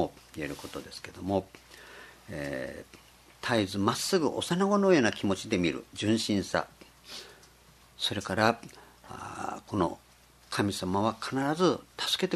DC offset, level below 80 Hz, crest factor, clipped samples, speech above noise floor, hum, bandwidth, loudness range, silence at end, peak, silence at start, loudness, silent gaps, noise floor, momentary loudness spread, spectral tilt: under 0.1%; -62 dBFS; 24 dB; under 0.1%; 28 dB; none; 13.5 kHz; 6 LU; 0 s; -6 dBFS; 0 s; -30 LUFS; none; -58 dBFS; 18 LU; -4.5 dB/octave